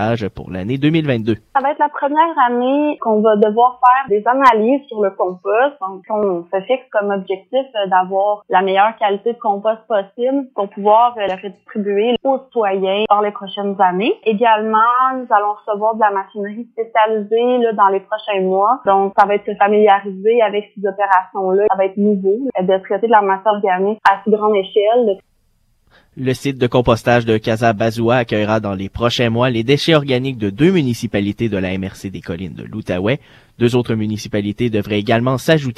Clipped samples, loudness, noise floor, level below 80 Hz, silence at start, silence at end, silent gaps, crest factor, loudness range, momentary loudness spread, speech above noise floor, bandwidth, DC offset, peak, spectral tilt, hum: under 0.1%; -16 LUFS; -59 dBFS; -48 dBFS; 0 s; 0.05 s; none; 16 dB; 4 LU; 9 LU; 43 dB; 14 kHz; under 0.1%; 0 dBFS; -6.5 dB/octave; none